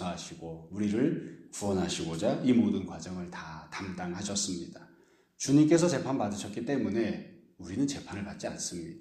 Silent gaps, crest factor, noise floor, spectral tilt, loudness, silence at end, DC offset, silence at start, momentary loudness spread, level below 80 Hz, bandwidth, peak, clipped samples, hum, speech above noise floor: none; 20 dB; -63 dBFS; -5 dB/octave; -31 LUFS; 0 s; under 0.1%; 0 s; 16 LU; -62 dBFS; 13.5 kHz; -12 dBFS; under 0.1%; none; 32 dB